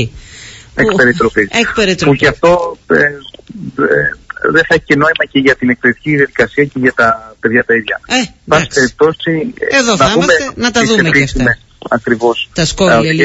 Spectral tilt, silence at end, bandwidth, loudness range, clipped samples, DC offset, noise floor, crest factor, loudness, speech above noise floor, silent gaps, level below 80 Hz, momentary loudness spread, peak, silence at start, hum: -4.5 dB/octave; 0 s; 8 kHz; 1 LU; under 0.1%; under 0.1%; -33 dBFS; 12 dB; -11 LUFS; 22 dB; none; -34 dBFS; 8 LU; 0 dBFS; 0 s; none